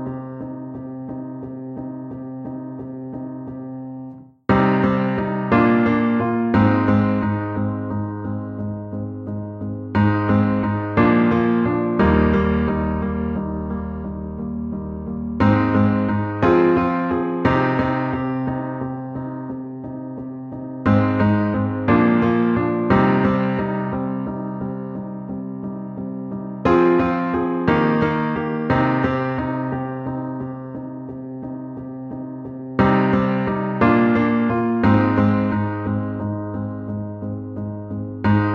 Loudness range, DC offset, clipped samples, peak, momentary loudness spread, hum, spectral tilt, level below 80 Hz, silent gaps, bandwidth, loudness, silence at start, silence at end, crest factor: 7 LU; under 0.1%; under 0.1%; -2 dBFS; 15 LU; none; -10 dB/octave; -40 dBFS; none; 6 kHz; -20 LUFS; 0 s; 0 s; 18 dB